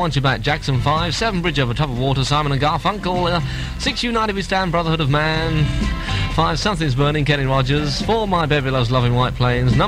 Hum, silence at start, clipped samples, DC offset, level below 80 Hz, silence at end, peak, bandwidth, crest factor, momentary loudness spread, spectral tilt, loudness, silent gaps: none; 0 s; under 0.1%; under 0.1%; -30 dBFS; 0 s; -4 dBFS; 13.5 kHz; 14 dB; 3 LU; -5.5 dB/octave; -18 LUFS; none